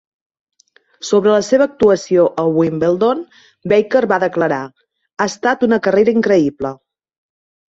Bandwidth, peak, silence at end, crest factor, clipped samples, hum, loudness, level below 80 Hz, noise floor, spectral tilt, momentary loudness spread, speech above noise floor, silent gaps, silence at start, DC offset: 8 kHz; -2 dBFS; 1 s; 14 dB; under 0.1%; none; -15 LUFS; -54 dBFS; -55 dBFS; -5.5 dB/octave; 12 LU; 40 dB; none; 1 s; under 0.1%